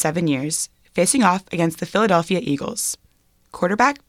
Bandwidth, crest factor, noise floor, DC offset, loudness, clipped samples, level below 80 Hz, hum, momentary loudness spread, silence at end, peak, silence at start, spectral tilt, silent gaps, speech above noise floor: 16 kHz; 18 dB; -59 dBFS; under 0.1%; -20 LUFS; under 0.1%; -56 dBFS; none; 8 LU; 0.1 s; -4 dBFS; 0 s; -4 dB/octave; none; 39 dB